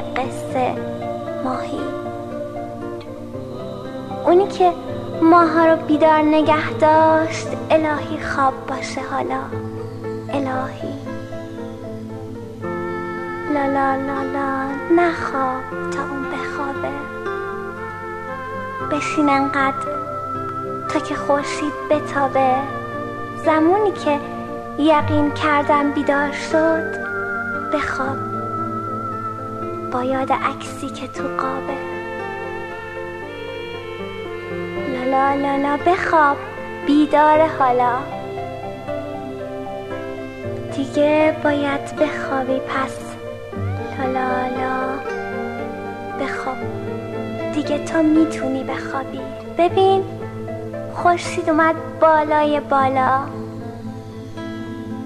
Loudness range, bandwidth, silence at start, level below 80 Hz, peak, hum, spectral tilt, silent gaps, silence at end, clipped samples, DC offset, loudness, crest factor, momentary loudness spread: 9 LU; 13 kHz; 0 s; -50 dBFS; -2 dBFS; 50 Hz at -45 dBFS; -6 dB/octave; none; 0 s; under 0.1%; under 0.1%; -20 LUFS; 18 dB; 14 LU